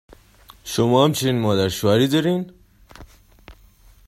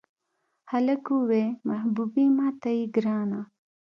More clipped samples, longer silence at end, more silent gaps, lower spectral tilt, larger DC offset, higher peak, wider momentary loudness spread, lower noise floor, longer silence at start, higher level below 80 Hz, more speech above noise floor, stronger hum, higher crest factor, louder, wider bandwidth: neither; first, 0.55 s vs 0.4 s; neither; second, -5.5 dB/octave vs -9 dB/octave; neither; first, -2 dBFS vs -12 dBFS; about the same, 11 LU vs 9 LU; second, -51 dBFS vs -77 dBFS; about the same, 0.65 s vs 0.65 s; first, -52 dBFS vs -78 dBFS; second, 32 dB vs 52 dB; neither; about the same, 18 dB vs 14 dB; first, -19 LUFS vs -26 LUFS; first, 16 kHz vs 6 kHz